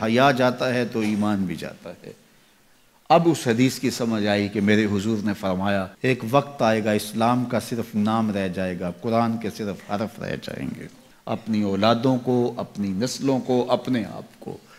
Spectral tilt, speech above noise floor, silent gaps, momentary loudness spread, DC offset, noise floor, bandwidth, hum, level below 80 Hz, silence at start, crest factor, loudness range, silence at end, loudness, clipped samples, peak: -6 dB/octave; 34 dB; none; 12 LU; under 0.1%; -57 dBFS; 15.5 kHz; none; -60 dBFS; 0 s; 18 dB; 4 LU; 0.2 s; -23 LUFS; under 0.1%; -4 dBFS